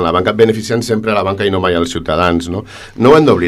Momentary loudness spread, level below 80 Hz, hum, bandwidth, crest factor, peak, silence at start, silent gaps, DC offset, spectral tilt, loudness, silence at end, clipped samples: 9 LU; -40 dBFS; none; 13 kHz; 12 dB; 0 dBFS; 0 s; none; under 0.1%; -6 dB/octave; -13 LUFS; 0 s; 0.2%